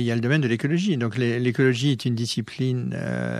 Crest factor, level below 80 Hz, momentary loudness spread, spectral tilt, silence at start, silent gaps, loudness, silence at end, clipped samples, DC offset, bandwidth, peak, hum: 14 dB; -62 dBFS; 6 LU; -6.5 dB/octave; 0 s; none; -23 LUFS; 0 s; under 0.1%; under 0.1%; 12.5 kHz; -8 dBFS; none